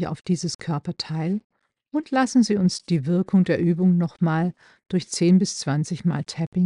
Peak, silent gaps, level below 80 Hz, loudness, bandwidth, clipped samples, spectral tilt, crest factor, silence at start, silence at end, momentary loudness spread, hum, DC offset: -8 dBFS; 0.55-0.59 s, 1.44-1.50 s, 6.47-6.52 s; -62 dBFS; -23 LUFS; 11 kHz; under 0.1%; -6 dB/octave; 14 dB; 0 s; 0 s; 9 LU; none; under 0.1%